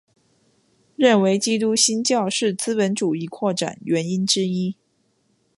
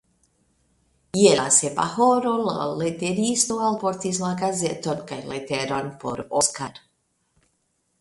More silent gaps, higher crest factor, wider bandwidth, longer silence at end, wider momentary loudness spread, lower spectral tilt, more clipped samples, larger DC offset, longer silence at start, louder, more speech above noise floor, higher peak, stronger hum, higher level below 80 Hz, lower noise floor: neither; about the same, 18 dB vs 22 dB; about the same, 11.5 kHz vs 11.5 kHz; second, 0.85 s vs 1.25 s; second, 8 LU vs 13 LU; about the same, -4 dB/octave vs -3.5 dB/octave; neither; neither; second, 1 s vs 1.15 s; about the same, -20 LUFS vs -22 LUFS; about the same, 46 dB vs 48 dB; about the same, -4 dBFS vs -2 dBFS; neither; second, -68 dBFS vs -60 dBFS; second, -66 dBFS vs -71 dBFS